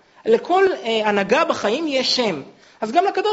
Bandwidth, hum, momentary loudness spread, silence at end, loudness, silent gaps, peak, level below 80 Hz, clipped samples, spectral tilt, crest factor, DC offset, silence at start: 8 kHz; none; 4 LU; 0 s; -19 LUFS; none; -2 dBFS; -62 dBFS; under 0.1%; -1.5 dB/octave; 16 dB; under 0.1%; 0.25 s